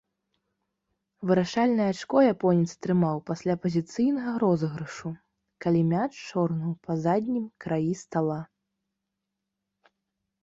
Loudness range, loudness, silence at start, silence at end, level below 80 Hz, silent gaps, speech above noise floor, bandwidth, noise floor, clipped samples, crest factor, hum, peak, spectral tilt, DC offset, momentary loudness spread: 6 LU; -27 LUFS; 1.2 s; 2 s; -66 dBFS; none; 58 dB; 7.8 kHz; -84 dBFS; under 0.1%; 18 dB; none; -10 dBFS; -7.5 dB/octave; under 0.1%; 11 LU